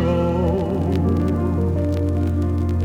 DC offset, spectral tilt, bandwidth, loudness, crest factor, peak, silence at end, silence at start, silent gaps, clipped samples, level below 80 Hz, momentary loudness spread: under 0.1%; -9.5 dB/octave; 7.4 kHz; -21 LUFS; 12 dB; -8 dBFS; 0 s; 0 s; none; under 0.1%; -36 dBFS; 2 LU